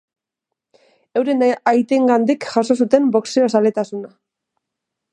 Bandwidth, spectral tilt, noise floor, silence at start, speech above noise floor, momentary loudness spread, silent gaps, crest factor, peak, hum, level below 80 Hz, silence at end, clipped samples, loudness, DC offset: 9.4 kHz; -5.5 dB/octave; -82 dBFS; 1.15 s; 66 dB; 9 LU; none; 18 dB; 0 dBFS; none; -66 dBFS; 1.05 s; under 0.1%; -17 LUFS; under 0.1%